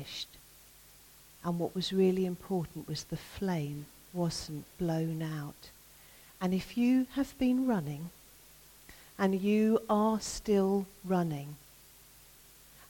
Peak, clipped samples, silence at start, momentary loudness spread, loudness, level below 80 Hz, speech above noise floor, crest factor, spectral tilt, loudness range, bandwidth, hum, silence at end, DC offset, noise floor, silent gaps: -16 dBFS; under 0.1%; 0 s; 17 LU; -32 LUFS; -60 dBFS; 26 dB; 18 dB; -6 dB/octave; 6 LU; 17.5 kHz; none; 0.05 s; under 0.1%; -57 dBFS; none